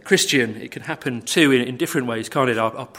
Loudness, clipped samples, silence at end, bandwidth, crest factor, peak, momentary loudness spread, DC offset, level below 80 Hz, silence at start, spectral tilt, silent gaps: -20 LUFS; under 0.1%; 0 s; 16.5 kHz; 20 dB; -2 dBFS; 11 LU; under 0.1%; -64 dBFS; 0.05 s; -3.5 dB/octave; none